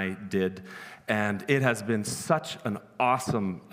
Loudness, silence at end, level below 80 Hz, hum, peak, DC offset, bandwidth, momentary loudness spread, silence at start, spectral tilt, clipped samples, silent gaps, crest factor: -28 LUFS; 0.05 s; -66 dBFS; none; -8 dBFS; under 0.1%; 16 kHz; 10 LU; 0 s; -5 dB/octave; under 0.1%; none; 22 dB